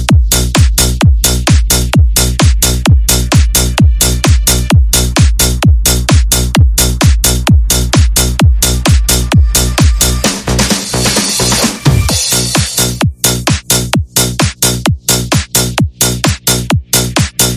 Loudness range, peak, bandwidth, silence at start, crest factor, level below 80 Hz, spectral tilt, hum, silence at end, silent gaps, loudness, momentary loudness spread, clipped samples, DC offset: 2 LU; 0 dBFS; over 20 kHz; 0 s; 10 dB; -14 dBFS; -3.5 dB/octave; none; 0 s; none; -10 LUFS; 3 LU; 0.3%; under 0.1%